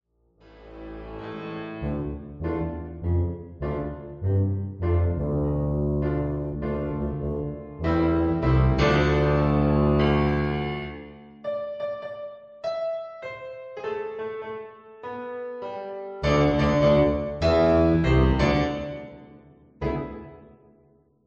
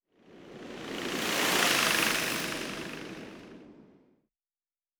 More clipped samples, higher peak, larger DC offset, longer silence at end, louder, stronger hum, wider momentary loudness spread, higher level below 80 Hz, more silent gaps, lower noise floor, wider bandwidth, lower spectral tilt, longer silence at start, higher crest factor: neither; about the same, -8 dBFS vs -10 dBFS; neither; second, 0.8 s vs 1.15 s; first, -25 LUFS vs -28 LUFS; neither; second, 17 LU vs 23 LU; first, -34 dBFS vs -64 dBFS; neither; second, -60 dBFS vs under -90 dBFS; second, 7.4 kHz vs over 20 kHz; first, -8 dB/octave vs -1.5 dB/octave; first, 0.55 s vs 0.3 s; second, 18 dB vs 24 dB